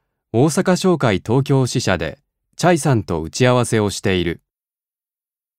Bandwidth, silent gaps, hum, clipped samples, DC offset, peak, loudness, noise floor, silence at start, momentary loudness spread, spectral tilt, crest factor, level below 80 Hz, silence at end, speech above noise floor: 15.5 kHz; none; none; under 0.1%; under 0.1%; 0 dBFS; -18 LUFS; under -90 dBFS; 0.35 s; 8 LU; -5.5 dB/octave; 18 dB; -46 dBFS; 1.25 s; over 73 dB